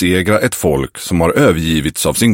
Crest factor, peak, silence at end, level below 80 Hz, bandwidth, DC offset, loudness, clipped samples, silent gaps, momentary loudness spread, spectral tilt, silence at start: 14 dB; 0 dBFS; 0 s; -32 dBFS; 17 kHz; under 0.1%; -14 LUFS; under 0.1%; none; 5 LU; -5 dB/octave; 0 s